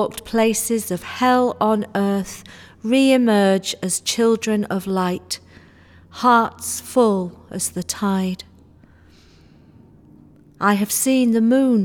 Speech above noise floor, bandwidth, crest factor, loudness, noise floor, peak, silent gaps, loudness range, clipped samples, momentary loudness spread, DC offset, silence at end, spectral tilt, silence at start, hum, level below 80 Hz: 31 dB; 19 kHz; 16 dB; -19 LUFS; -49 dBFS; -4 dBFS; none; 6 LU; under 0.1%; 11 LU; under 0.1%; 0 s; -4.5 dB/octave; 0 s; none; -56 dBFS